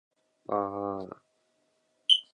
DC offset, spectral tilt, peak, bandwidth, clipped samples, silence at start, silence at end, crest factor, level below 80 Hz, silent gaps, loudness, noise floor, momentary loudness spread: under 0.1%; -3.5 dB/octave; -8 dBFS; 11 kHz; under 0.1%; 0.5 s; 0.1 s; 24 dB; -72 dBFS; none; -29 LUFS; -73 dBFS; 21 LU